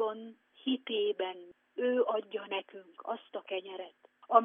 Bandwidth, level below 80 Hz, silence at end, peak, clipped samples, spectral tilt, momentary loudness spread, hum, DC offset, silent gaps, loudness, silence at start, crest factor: 3.8 kHz; under -90 dBFS; 0 s; -10 dBFS; under 0.1%; -0.5 dB/octave; 16 LU; none; under 0.1%; none; -35 LUFS; 0 s; 24 dB